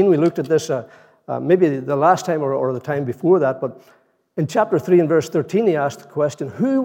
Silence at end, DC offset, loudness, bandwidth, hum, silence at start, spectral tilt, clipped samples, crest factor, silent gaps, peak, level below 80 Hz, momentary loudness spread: 0 s; under 0.1%; -19 LUFS; 16.5 kHz; none; 0 s; -7 dB/octave; under 0.1%; 16 dB; none; -2 dBFS; -72 dBFS; 10 LU